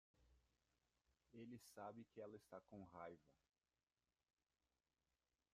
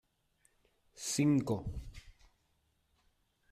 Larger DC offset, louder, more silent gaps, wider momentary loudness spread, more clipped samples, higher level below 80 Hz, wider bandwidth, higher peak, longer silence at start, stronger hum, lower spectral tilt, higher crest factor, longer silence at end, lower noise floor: neither; second, -61 LUFS vs -34 LUFS; neither; second, 5 LU vs 18 LU; neither; second, -88 dBFS vs -56 dBFS; second, 12 kHz vs 14.5 kHz; second, -42 dBFS vs -20 dBFS; second, 0.15 s vs 0.95 s; neither; about the same, -6 dB/octave vs -5.5 dB/octave; about the same, 22 dB vs 18 dB; first, 2.2 s vs 1.4 s; first, under -90 dBFS vs -77 dBFS